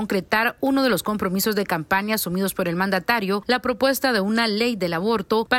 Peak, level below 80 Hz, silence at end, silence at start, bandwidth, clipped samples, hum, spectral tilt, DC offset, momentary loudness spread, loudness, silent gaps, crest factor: -6 dBFS; -54 dBFS; 0 s; 0 s; 16.5 kHz; under 0.1%; none; -4.5 dB/octave; under 0.1%; 3 LU; -22 LUFS; none; 16 dB